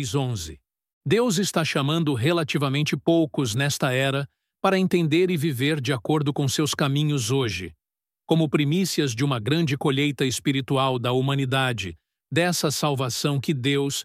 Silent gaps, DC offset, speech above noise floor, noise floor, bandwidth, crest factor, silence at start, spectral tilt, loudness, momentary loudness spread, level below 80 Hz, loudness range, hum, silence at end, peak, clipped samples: 0.93-1.01 s; under 0.1%; over 67 dB; under -90 dBFS; 16 kHz; 18 dB; 0 s; -5 dB/octave; -23 LUFS; 5 LU; -58 dBFS; 1 LU; none; 0 s; -6 dBFS; under 0.1%